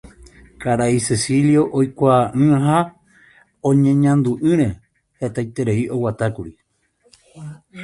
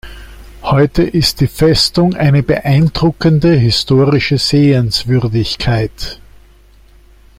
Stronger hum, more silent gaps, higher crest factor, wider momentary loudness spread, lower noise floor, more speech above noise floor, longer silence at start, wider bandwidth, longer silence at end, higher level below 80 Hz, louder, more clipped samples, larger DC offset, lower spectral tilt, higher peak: neither; neither; first, 18 dB vs 12 dB; first, 18 LU vs 6 LU; first, -61 dBFS vs -43 dBFS; first, 44 dB vs 32 dB; about the same, 0.05 s vs 0.05 s; second, 11.5 kHz vs 16 kHz; second, 0 s vs 1.25 s; second, -48 dBFS vs -32 dBFS; second, -18 LUFS vs -12 LUFS; neither; neither; about the same, -6.5 dB/octave vs -6 dB/octave; about the same, -2 dBFS vs 0 dBFS